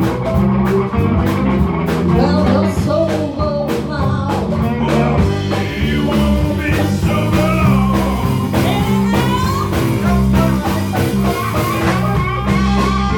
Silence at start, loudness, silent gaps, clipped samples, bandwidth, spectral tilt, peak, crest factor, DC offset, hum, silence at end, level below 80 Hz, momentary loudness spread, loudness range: 0 s; -15 LUFS; none; under 0.1%; over 20 kHz; -7 dB/octave; 0 dBFS; 14 dB; under 0.1%; none; 0 s; -26 dBFS; 4 LU; 1 LU